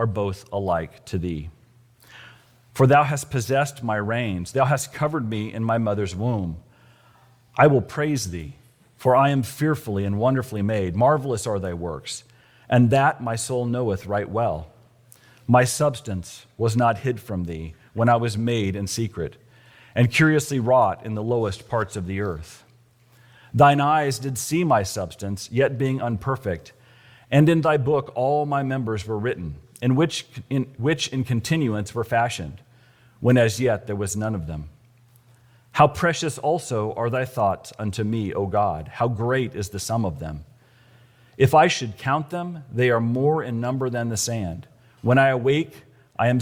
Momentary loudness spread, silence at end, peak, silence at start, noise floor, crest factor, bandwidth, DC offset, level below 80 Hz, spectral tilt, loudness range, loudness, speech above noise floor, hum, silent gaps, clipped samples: 13 LU; 0 s; -2 dBFS; 0 s; -56 dBFS; 20 dB; 16.5 kHz; under 0.1%; -50 dBFS; -6 dB/octave; 3 LU; -23 LUFS; 34 dB; none; none; under 0.1%